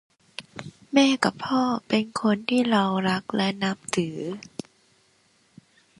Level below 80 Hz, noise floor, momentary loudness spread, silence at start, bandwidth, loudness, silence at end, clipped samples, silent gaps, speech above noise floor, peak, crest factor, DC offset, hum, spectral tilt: -66 dBFS; -63 dBFS; 19 LU; 0.4 s; 11.5 kHz; -24 LUFS; 1.6 s; under 0.1%; none; 40 dB; -6 dBFS; 20 dB; under 0.1%; none; -5 dB/octave